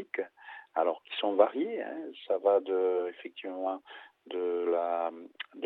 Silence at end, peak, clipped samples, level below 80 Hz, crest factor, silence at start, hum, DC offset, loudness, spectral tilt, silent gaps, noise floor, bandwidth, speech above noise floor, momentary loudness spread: 0 s; -8 dBFS; under 0.1%; under -90 dBFS; 24 dB; 0 s; none; under 0.1%; -31 LUFS; -6.5 dB/octave; none; -51 dBFS; 4.2 kHz; 20 dB; 15 LU